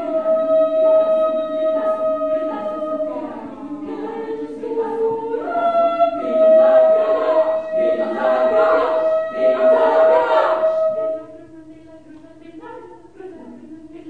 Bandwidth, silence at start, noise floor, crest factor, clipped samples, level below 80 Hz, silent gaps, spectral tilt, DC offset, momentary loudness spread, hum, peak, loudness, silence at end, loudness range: 4.8 kHz; 0 s; -42 dBFS; 14 dB; under 0.1%; -60 dBFS; none; -6 dB/octave; 0.3%; 17 LU; none; -4 dBFS; -17 LUFS; 0 s; 9 LU